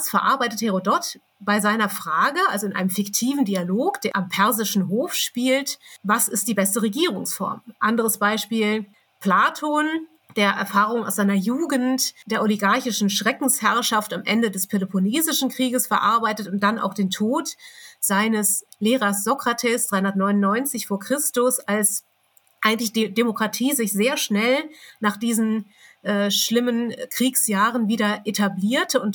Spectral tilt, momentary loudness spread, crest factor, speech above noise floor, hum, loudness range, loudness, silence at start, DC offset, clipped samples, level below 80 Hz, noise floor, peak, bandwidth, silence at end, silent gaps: -3.5 dB/octave; 6 LU; 20 dB; 39 dB; none; 1 LU; -21 LUFS; 0 s; under 0.1%; under 0.1%; -84 dBFS; -61 dBFS; -2 dBFS; 19.5 kHz; 0 s; none